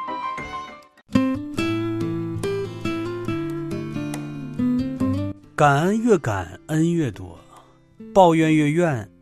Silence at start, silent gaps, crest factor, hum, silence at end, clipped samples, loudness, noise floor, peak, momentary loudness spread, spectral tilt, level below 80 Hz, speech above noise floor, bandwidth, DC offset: 0 s; none; 20 dB; none; 0.15 s; under 0.1%; -22 LUFS; -50 dBFS; -2 dBFS; 13 LU; -7 dB/octave; -50 dBFS; 31 dB; 13.5 kHz; under 0.1%